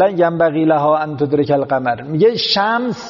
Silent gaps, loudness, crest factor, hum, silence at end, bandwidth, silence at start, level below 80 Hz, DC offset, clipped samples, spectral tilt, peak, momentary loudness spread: none; -15 LUFS; 12 dB; none; 0 s; 7.2 kHz; 0 s; -56 dBFS; under 0.1%; under 0.1%; -4 dB/octave; -2 dBFS; 4 LU